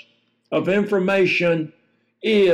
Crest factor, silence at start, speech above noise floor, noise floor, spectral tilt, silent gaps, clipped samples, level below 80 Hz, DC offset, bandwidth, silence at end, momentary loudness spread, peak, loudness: 12 dB; 0.5 s; 41 dB; -59 dBFS; -6.5 dB/octave; none; under 0.1%; -66 dBFS; under 0.1%; 10 kHz; 0 s; 9 LU; -8 dBFS; -20 LUFS